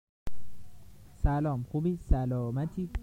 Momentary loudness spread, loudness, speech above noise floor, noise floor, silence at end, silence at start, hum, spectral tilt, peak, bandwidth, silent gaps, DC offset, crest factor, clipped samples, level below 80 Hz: 19 LU; -32 LUFS; 21 dB; -51 dBFS; 0 s; 0.05 s; none; -9.5 dB/octave; -12 dBFS; 15.5 kHz; 0.09-0.26 s; under 0.1%; 18 dB; under 0.1%; -36 dBFS